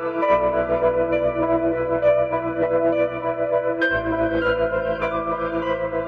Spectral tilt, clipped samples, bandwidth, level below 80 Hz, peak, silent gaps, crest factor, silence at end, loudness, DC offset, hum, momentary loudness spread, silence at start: -8 dB/octave; under 0.1%; 5.8 kHz; -44 dBFS; -6 dBFS; none; 14 dB; 0 s; -21 LUFS; under 0.1%; none; 5 LU; 0 s